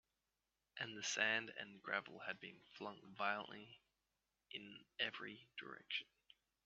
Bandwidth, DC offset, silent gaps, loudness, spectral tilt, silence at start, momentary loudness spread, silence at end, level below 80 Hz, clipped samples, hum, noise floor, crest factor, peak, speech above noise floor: 7.2 kHz; under 0.1%; none; -45 LUFS; 0 dB/octave; 0.75 s; 17 LU; 0.6 s; -90 dBFS; under 0.1%; none; under -90 dBFS; 28 dB; -22 dBFS; over 43 dB